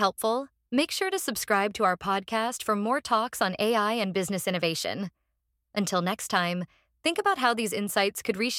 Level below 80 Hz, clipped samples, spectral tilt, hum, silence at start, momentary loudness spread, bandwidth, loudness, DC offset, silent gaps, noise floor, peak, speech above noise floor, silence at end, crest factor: -66 dBFS; under 0.1%; -3.5 dB/octave; none; 0 s; 6 LU; 17.5 kHz; -27 LUFS; under 0.1%; none; -78 dBFS; -8 dBFS; 51 dB; 0 s; 20 dB